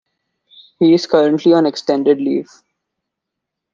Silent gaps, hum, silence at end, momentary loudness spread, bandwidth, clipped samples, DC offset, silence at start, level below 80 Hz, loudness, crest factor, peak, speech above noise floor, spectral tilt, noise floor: none; none; 1.3 s; 5 LU; 7.2 kHz; under 0.1%; under 0.1%; 0.8 s; -64 dBFS; -14 LUFS; 16 dB; -2 dBFS; 66 dB; -6.5 dB/octave; -80 dBFS